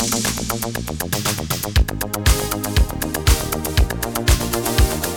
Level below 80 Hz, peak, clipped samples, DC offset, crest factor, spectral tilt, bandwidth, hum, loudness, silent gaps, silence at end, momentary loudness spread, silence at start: -22 dBFS; -2 dBFS; under 0.1%; 0.4%; 18 dB; -4 dB/octave; 19.5 kHz; none; -20 LUFS; none; 0 s; 5 LU; 0 s